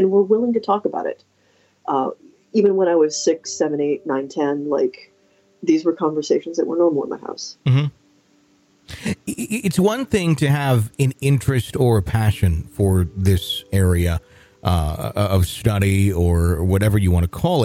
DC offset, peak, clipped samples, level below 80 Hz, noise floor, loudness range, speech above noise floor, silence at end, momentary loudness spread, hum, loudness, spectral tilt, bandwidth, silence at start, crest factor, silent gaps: under 0.1%; -4 dBFS; under 0.1%; -36 dBFS; -58 dBFS; 3 LU; 40 dB; 0 s; 9 LU; none; -20 LUFS; -6.5 dB/octave; 16 kHz; 0 s; 14 dB; none